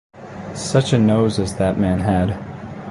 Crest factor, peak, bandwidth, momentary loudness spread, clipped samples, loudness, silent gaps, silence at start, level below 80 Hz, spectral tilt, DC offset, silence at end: 16 dB; -2 dBFS; 11.5 kHz; 17 LU; under 0.1%; -18 LUFS; none; 0.15 s; -38 dBFS; -6.5 dB/octave; under 0.1%; 0 s